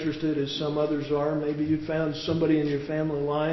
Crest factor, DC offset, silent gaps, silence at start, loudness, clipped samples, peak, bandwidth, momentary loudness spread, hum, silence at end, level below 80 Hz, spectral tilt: 14 dB; under 0.1%; none; 0 s; -27 LUFS; under 0.1%; -14 dBFS; 6 kHz; 4 LU; none; 0 s; -54 dBFS; -7.5 dB/octave